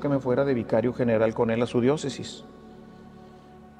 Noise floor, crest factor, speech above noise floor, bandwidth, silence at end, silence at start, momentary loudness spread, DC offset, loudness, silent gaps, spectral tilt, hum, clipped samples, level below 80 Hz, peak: -48 dBFS; 16 dB; 24 dB; 10 kHz; 0.15 s; 0 s; 14 LU; under 0.1%; -25 LUFS; none; -7 dB/octave; none; under 0.1%; -56 dBFS; -10 dBFS